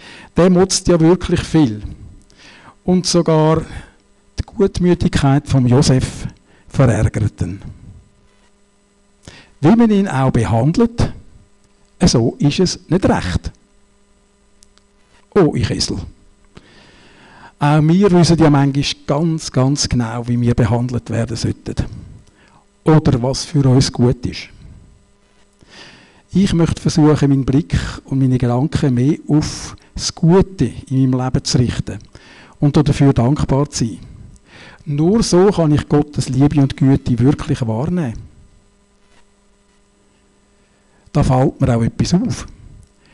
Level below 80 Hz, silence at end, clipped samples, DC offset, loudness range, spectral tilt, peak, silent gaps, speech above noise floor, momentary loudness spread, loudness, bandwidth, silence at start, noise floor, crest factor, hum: -34 dBFS; 0.6 s; under 0.1%; under 0.1%; 6 LU; -6.5 dB/octave; -4 dBFS; none; 40 dB; 13 LU; -15 LUFS; 11.5 kHz; 0.05 s; -54 dBFS; 12 dB; none